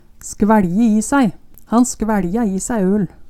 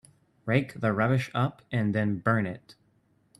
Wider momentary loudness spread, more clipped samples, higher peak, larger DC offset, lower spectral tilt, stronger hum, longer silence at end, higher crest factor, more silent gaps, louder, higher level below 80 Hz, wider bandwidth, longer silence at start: about the same, 5 LU vs 7 LU; neither; first, 0 dBFS vs -10 dBFS; neither; second, -6 dB/octave vs -8 dB/octave; neither; second, 0 s vs 0.65 s; about the same, 16 dB vs 20 dB; neither; first, -16 LUFS vs -28 LUFS; first, -38 dBFS vs -64 dBFS; first, 14 kHz vs 12 kHz; second, 0.2 s vs 0.45 s